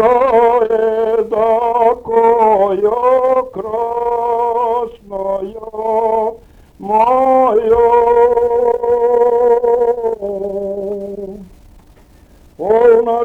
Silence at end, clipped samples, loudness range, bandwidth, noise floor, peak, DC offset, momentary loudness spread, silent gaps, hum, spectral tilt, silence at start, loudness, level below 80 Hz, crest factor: 0 s; under 0.1%; 6 LU; 4.1 kHz; -44 dBFS; 0 dBFS; under 0.1%; 12 LU; none; none; -7 dB/octave; 0 s; -13 LUFS; -44 dBFS; 12 dB